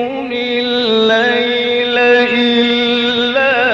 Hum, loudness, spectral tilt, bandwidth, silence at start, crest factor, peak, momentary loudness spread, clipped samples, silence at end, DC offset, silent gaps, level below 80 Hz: none; -12 LUFS; -4 dB/octave; 7.4 kHz; 0 s; 12 dB; -2 dBFS; 5 LU; under 0.1%; 0 s; under 0.1%; none; -52 dBFS